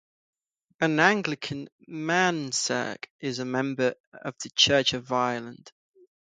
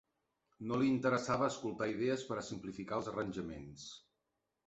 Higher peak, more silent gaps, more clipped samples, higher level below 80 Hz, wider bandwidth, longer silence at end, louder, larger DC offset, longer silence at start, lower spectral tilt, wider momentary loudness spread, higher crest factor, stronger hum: first, -4 dBFS vs -20 dBFS; first, 1.72-1.79 s, 3.10-3.19 s, 4.00-4.12 s vs none; neither; about the same, -64 dBFS vs -68 dBFS; first, 9.6 kHz vs 8 kHz; about the same, 0.65 s vs 0.7 s; first, -26 LUFS vs -37 LUFS; neither; first, 0.8 s vs 0.6 s; second, -3 dB/octave vs -5 dB/octave; about the same, 16 LU vs 15 LU; first, 24 dB vs 18 dB; neither